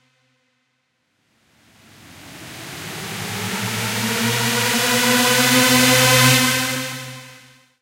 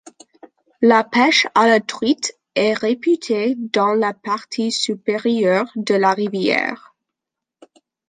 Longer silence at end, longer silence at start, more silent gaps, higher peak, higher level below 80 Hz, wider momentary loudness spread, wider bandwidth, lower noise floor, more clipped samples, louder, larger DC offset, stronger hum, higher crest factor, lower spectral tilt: second, 0.45 s vs 1.35 s; first, 2.15 s vs 0.8 s; neither; about the same, -2 dBFS vs -2 dBFS; first, -56 dBFS vs -68 dBFS; first, 21 LU vs 8 LU; first, 16 kHz vs 9.6 kHz; second, -69 dBFS vs -84 dBFS; neither; about the same, -16 LUFS vs -18 LUFS; neither; neither; about the same, 18 dB vs 18 dB; second, -2.5 dB/octave vs -4 dB/octave